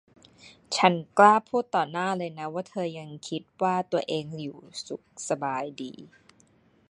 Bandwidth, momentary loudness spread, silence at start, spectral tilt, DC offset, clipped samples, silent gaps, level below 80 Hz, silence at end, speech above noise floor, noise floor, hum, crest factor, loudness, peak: 11.5 kHz; 19 LU; 0.45 s; -4.5 dB/octave; under 0.1%; under 0.1%; none; -74 dBFS; 0.85 s; 35 dB; -62 dBFS; none; 24 dB; -26 LUFS; -4 dBFS